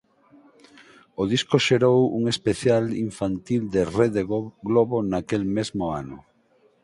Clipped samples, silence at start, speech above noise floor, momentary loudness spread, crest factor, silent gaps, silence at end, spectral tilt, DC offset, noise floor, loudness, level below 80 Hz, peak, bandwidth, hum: under 0.1%; 1.2 s; 39 dB; 10 LU; 20 dB; none; 0.65 s; -6 dB/octave; under 0.1%; -61 dBFS; -23 LUFS; -52 dBFS; -4 dBFS; 11.5 kHz; none